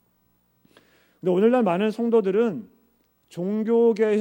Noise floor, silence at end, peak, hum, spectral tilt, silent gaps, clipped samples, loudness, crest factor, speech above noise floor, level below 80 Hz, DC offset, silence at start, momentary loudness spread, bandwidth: -66 dBFS; 0 s; -8 dBFS; none; -8 dB/octave; none; under 0.1%; -22 LUFS; 16 dB; 45 dB; -76 dBFS; under 0.1%; 1.25 s; 12 LU; 16 kHz